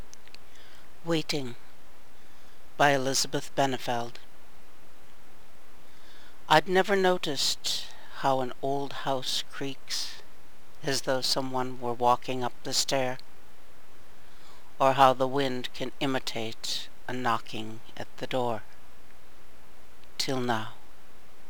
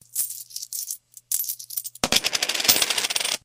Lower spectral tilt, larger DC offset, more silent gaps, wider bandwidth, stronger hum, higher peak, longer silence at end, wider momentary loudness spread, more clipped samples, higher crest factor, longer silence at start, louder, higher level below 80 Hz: first, -3.5 dB/octave vs 0.5 dB/octave; first, 3% vs under 0.1%; neither; first, over 20 kHz vs 16.5 kHz; neither; about the same, -4 dBFS vs -2 dBFS; first, 0.75 s vs 0.05 s; first, 17 LU vs 13 LU; neither; about the same, 26 dB vs 24 dB; second, 0 s vs 0.15 s; second, -28 LUFS vs -22 LUFS; about the same, -60 dBFS vs -58 dBFS